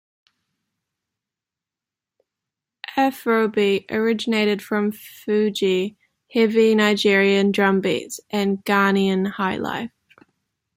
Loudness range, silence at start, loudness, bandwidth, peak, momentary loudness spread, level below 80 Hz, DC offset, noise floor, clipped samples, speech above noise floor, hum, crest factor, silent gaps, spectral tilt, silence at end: 6 LU; 2.9 s; -20 LUFS; 16 kHz; -4 dBFS; 11 LU; -66 dBFS; under 0.1%; -88 dBFS; under 0.1%; 69 dB; none; 16 dB; none; -5.5 dB/octave; 0.9 s